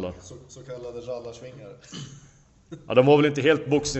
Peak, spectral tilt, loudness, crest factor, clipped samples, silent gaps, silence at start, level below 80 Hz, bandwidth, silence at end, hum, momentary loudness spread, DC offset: -4 dBFS; -5.5 dB/octave; -21 LUFS; 22 dB; under 0.1%; none; 0 s; -54 dBFS; 8.4 kHz; 0 s; none; 25 LU; under 0.1%